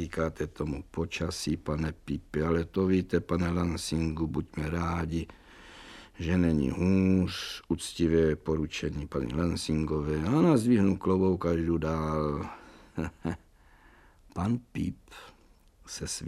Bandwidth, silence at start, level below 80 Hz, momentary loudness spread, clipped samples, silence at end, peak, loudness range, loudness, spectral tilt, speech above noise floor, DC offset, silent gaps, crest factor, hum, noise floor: 14 kHz; 0 s; -46 dBFS; 15 LU; under 0.1%; 0 s; -10 dBFS; 7 LU; -30 LUFS; -6.5 dB/octave; 31 dB; under 0.1%; none; 18 dB; none; -60 dBFS